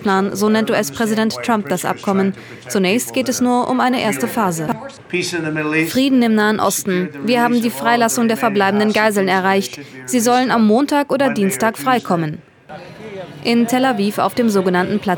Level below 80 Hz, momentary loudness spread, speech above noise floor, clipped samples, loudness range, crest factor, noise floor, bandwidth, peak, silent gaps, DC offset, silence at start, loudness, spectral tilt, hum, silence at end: -62 dBFS; 9 LU; 20 dB; under 0.1%; 3 LU; 16 dB; -36 dBFS; over 20 kHz; 0 dBFS; none; under 0.1%; 0 s; -16 LUFS; -4.5 dB/octave; none; 0 s